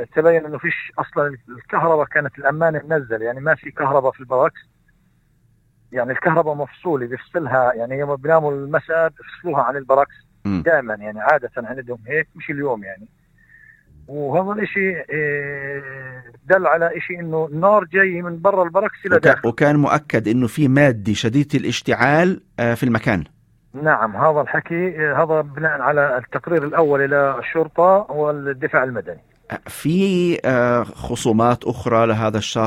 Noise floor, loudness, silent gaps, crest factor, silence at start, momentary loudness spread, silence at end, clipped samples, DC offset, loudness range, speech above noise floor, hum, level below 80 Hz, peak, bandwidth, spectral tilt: -58 dBFS; -19 LUFS; none; 18 dB; 0 s; 11 LU; 0 s; under 0.1%; under 0.1%; 6 LU; 40 dB; none; -52 dBFS; 0 dBFS; 16.5 kHz; -6.5 dB/octave